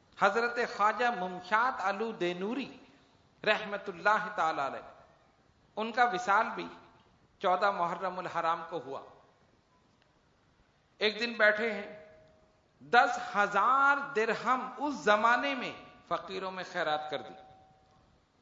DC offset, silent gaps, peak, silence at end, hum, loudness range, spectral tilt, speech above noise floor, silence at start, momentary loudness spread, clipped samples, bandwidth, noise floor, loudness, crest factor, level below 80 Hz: under 0.1%; none; -10 dBFS; 0.95 s; none; 6 LU; -1 dB/octave; 37 dB; 0.15 s; 14 LU; under 0.1%; 7.4 kHz; -68 dBFS; -30 LUFS; 22 dB; -76 dBFS